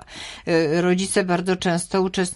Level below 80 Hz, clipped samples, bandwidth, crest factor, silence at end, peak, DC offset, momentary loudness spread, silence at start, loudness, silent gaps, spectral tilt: -52 dBFS; under 0.1%; 11.5 kHz; 16 dB; 0 s; -6 dBFS; under 0.1%; 4 LU; 0 s; -21 LUFS; none; -5 dB/octave